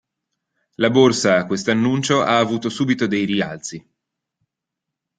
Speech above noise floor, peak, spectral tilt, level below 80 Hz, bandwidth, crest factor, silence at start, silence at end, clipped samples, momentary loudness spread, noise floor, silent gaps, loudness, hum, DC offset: 65 dB; -2 dBFS; -5 dB/octave; -60 dBFS; 9.4 kHz; 18 dB; 0.8 s; 1.4 s; under 0.1%; 11 LU; -83 dBFS; none; -18 LUFS; none; under 0.1%